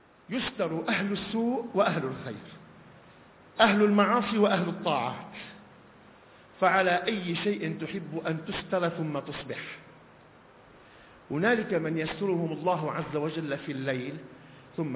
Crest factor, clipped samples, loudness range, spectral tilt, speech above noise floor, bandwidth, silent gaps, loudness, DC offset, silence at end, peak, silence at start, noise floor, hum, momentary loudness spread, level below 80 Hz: 20 dB; under 0.1%; 6 LU; -4 dB/octave; 26 dB; 4 kHz; none; -29 LUFS; under 0.1%; 0 s; -8 dBFS; 0.3 s; -55 dBFS; none; 17 LU; -64 dBFS